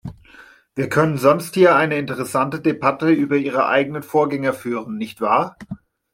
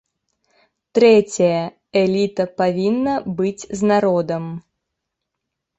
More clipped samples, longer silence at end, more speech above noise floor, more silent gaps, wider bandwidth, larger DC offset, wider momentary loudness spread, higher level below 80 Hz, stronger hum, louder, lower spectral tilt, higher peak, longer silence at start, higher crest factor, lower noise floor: neither; second, 0.4 s vs 1.2 s; second, 29 dB vs 62 dB; neither; first, 16.5 kHz vs 8.2 kHz; neither; first, 14 LU vs 11 LU; about the same, -58 dBFS vs -58 dBFS; neither; about the same, -19 LUFS vs -18 LUFS; about the same, -6.5 dB/octave vs -6 dB/octave; about the same, -2 dBFS vs -2 dBFS; second, 0.05 s vs 0.95 s; about the same, 18 dB vs 16 dB; second, -47 dBFS vs -80 dBFS